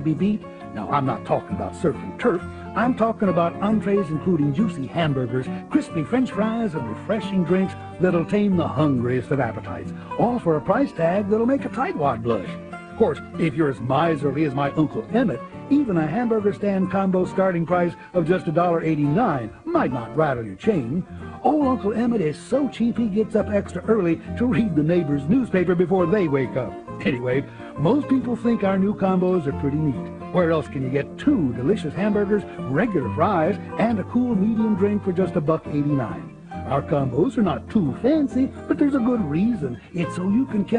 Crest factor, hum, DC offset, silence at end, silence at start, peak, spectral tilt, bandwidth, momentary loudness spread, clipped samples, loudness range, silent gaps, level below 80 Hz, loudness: 16 dB; none; under 0.1%; 0 s; 0 s; -4 dBFS; -8.5 dB/octave; 10 kHz; 6 LU; under 0.1%; 2 LU; none; -46 dBFS; -22 LUFS